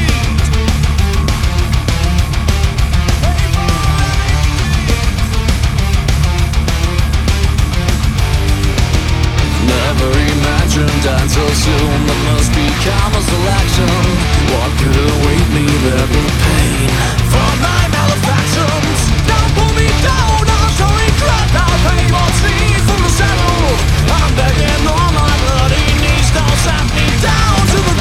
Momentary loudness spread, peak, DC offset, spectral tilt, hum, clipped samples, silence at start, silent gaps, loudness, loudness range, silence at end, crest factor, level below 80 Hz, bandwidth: 3 LU; 0 dBFS; under 0.1%; -5 dB/octave; none; under 0.1%; 0 s; none; -12 LUFS; 2 LU; 0 s; 10 dB; -16 dBFS; 16 kHz